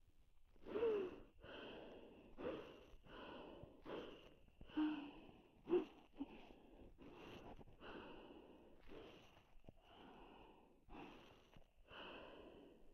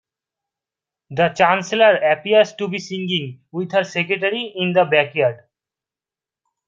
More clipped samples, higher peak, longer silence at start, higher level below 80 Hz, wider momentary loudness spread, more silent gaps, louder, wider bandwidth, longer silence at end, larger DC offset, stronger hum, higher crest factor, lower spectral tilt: neither; second, -30 dBFS vs -2 dBFS; second, 0 s vs 1.1 s; about the same, -70 dBFS vs -66 dBFS; first, 23 LU vs 10 LU; neither; second, -51 LUFS vs -18 LUFS; first, 12 kHz vs 7.6 kHz; second, 0 s vs 1.3 s; neither; neither; about the same, 22 dB vs 18 dB; first, -6.5 dB/octave vs -5 dB/octave